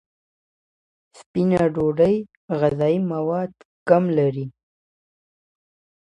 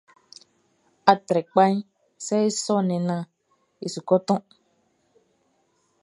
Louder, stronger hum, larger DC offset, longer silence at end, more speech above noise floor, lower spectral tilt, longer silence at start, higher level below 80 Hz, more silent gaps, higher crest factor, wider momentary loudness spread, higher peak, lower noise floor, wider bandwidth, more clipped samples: about the same, -21 LUFS vs -23 LUFS; neither; neither; about the same, 1.5 s vs 1.6 s; first, over 70 dB vs 46 dB; first, -9 dB/octave vs -5.5 dB/octave; first, 1.35 s vs 1.05 s; first, -56 dBFS vs -74 dBFS; first, 2.37-2.48 s, 3.65-3.86 s vs none; about the same, 20 dB vs 24 dB; about the same, 13 LU vs 14 LU; about the same, -2 dBFS vs 0 dBFS; first, under -90 dBFS vs -68 dBFS; about the same, 10.5 kHz vs 11.5 kHz; neither